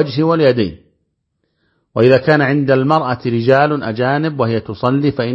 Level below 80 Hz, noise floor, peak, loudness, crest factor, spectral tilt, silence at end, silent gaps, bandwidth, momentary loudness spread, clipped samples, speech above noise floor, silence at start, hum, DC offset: -50 dBFS; -68 dBFS; 0 dBFS; -14 LUFS; 14 dB; -9 dB/octave; 0 s; none; 7.2 kHz; 7 LU; under 0.1%; 55 dB; 0 s; none; under 0.1%